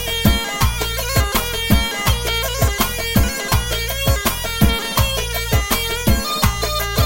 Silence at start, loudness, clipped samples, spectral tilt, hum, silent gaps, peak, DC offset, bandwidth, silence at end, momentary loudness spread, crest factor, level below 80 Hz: 0 s; -18 LUFS; under 0.1%; -3.5 dB/octave; none; none; 0 dBFS; under 0.1%; 16.5 kHz; 0 s; 2 LU; 18 dB; -24 dBFS